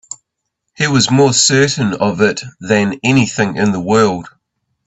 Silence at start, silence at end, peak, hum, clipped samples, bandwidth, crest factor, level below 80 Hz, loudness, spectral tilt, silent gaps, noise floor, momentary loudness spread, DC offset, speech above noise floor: 0.1 s; 0.6 s; 0 dBFS; none; under 0.1%; 8.4 kHz; 14 dB; -50 dBFS; -13 LUFS; -4 dB/octave; none; -74 dBFS; 10 LU; under 0.1%; 61 dB